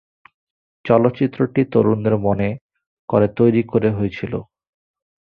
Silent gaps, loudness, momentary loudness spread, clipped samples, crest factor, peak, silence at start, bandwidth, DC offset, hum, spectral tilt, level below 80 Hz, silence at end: 2.61-2.69 s, 2.87-3.08 s; -18 LUFS; 12 LU; under 0.1%; 18 dB; -2 dBFS; 0.85 s; 5.2 kHz; under 0.1%; none; -11 dB/octave; -48 dBFS; 0.8 s